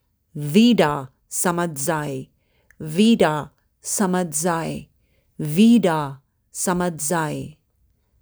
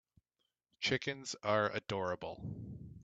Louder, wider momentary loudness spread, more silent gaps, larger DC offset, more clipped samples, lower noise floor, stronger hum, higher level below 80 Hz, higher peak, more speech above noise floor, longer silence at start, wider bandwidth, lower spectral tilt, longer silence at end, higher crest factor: first, -20 LUFS vs -37 LUFS; first, 19 LU vs 13 LU; neither; neither; neither; second, -64 dBFS vs -86 dBFS; neither; first, -56 dBFS vs -68 dBFS; first, -2 dBFS vs -18 dBFS; second, 45 dB vs 49 dB; second, 0.35 s vs 0.8 s; first, over 20 kHz vs 9 kHz; about the same, -4.5 dB/octave vs -4 dB/octave; first, 0.7 s vs 0 s; about the same, 18 dB vs 22 dB